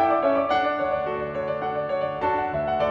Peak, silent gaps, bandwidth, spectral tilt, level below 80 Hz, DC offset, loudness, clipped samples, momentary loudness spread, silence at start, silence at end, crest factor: -10 dBFS; none; 6.8 kHz; -7 dB/octave; -52 dBFS; under 0.1%; -25 LUFS; under 0.1%; 6 LU; 0 s; 0 s; 14 dB